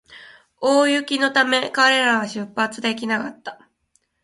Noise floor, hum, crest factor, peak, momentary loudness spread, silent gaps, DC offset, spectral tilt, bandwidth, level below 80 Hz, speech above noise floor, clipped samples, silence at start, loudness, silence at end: -67 dBFS; none; 18 dB; -2 dBFS; 11 LU; none; under 0.1%; -2.5 dB/octave; 11.5 kHz; -68 dBFS; 47 dB; under 0.1%; 0.1 s; -19 LUFS; 0.7 s